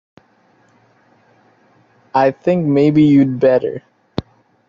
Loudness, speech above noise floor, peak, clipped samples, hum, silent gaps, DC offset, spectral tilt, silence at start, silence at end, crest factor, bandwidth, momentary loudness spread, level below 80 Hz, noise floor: -14 LUFS; 42 dB; -2 dBFS; under 0.1%; none; none; under 0.1%; -9 dB/octave; 2.15 s; 0.45 s; 14 dB; 7 kHz; 17 LU; -54 dBFS; -55 dBFS